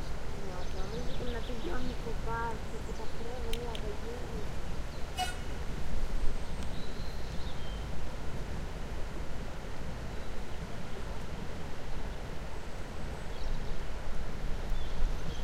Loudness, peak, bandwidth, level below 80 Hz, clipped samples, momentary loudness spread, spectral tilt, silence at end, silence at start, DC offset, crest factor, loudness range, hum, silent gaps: -41 LUFS; -14 dBFS; 11.5 kHz; -36 dBFS; under 0.1%; 5 LU; -5 dB/octave; 0 s; 0 s; under 0.1%; 16 dB; 3 LU; none; none